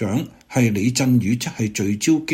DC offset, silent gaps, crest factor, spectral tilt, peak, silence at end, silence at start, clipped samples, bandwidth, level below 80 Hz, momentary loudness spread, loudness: under 0.1%; none; 14 dB; -5.5 dB/octave; -6 dBFS; 0 s; 0 s; under 0.1%; 16.5 kHz; -54 dBFS; 6 LU; -20 LUFS